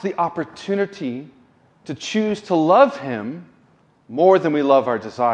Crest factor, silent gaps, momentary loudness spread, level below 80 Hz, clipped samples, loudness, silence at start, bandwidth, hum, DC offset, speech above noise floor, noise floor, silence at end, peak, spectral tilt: 18 dB; none; 16 LU; -66 dBFS; under 0.1%; -19 LUFS; 0 s; 9 kHz; none; under 0.1%; 38 dB; -56 dBFS; 0 s; -2 dBFS; -6 dB/octave